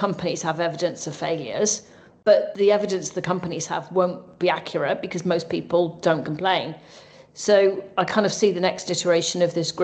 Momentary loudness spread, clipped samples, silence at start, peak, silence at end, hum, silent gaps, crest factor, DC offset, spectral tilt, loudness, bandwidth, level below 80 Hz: 8 LU; under 0.1%; 0 s; -4 dBFS; 0 s; none; none; 20 dB; under 0.1%; -4 dB/octave; -23 LUFS; 9.2 kHz; -66 dBFS